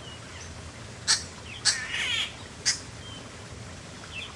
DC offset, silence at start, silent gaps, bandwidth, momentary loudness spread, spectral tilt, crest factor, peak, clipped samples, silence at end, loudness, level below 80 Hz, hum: under 0.1%; 0 s; none; 11.5 kHz; 17 LU; -0.5 dB/octave; 28 dB; -6 dBFS; under 0.1%; 0 s; -27 LUFS; -54 dBFS; none